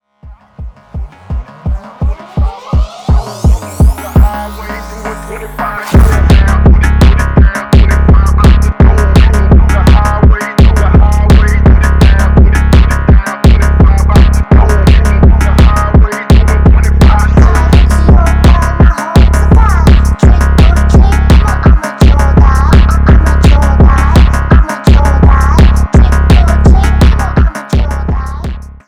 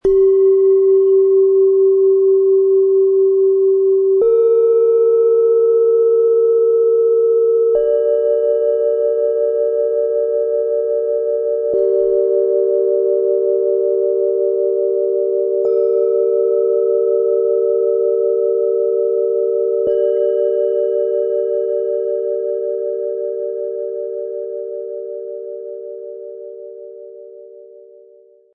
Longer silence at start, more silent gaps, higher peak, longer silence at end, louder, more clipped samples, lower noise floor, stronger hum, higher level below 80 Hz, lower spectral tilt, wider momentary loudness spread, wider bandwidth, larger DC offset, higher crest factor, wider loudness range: first, 0.25 s vs 0.05 s; neither; first, 0 dBFS vs -6 dBFS; second, 0.2 s vs 0.8 s; first, -8 LUFS vs -15 LUFS; first, 1% vs under 0.1%; second, -35 dBFS vs -47 dBFS; neither; first, -8 dBFS vs -54 dBFS; second, -7 dB/octave vs -9.5 dB/octave; about the same, 10 LU vs 12 LU; first, 12 kHz vs 1.7 kHz; first, 0.4% vs under 0.1%; about the same, 6 dB vs 8 dB; second, 6 LU vs 12 LU